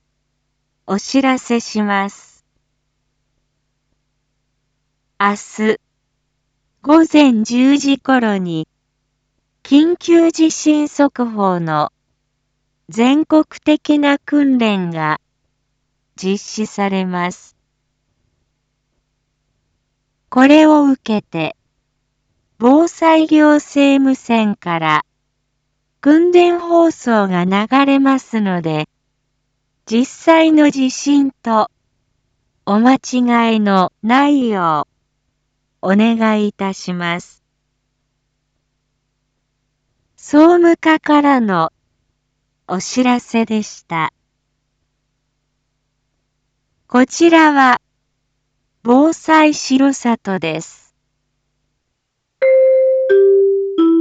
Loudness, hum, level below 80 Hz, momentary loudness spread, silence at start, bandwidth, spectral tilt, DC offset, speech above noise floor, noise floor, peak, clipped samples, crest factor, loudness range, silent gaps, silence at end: -14 LUFS; none; -62 dBFS; 12 LU; 0.85 s; 8 kHz; -5 dB/octave; under 0.1%; 59 dB; -72 dBFS; 0 dBFS; under 0.1%; 16 dB; 10 LU; none; 0 s